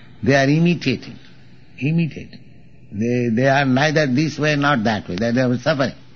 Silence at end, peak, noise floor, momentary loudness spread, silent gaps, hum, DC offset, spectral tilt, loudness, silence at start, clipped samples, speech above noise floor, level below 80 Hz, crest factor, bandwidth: 0.2 s; -4 dBFS; -47 dBFS; 10 LU; none; none; 0.7%; -5 dB/octave; -18 LUFS; 0.2 s; under 0.1%; 29 dB; -52 dBFS; 16 dB; 7 kHz